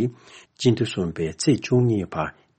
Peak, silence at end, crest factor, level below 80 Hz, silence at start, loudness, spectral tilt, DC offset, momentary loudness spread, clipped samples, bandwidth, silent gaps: -6 dBFS; 0.25 s; 16 dB; -52 dBFS; 0 s; -23 LUFS; -6 dB/octave; under 0.1%; 9 LU; under 0.1%; 8.8 kHz; none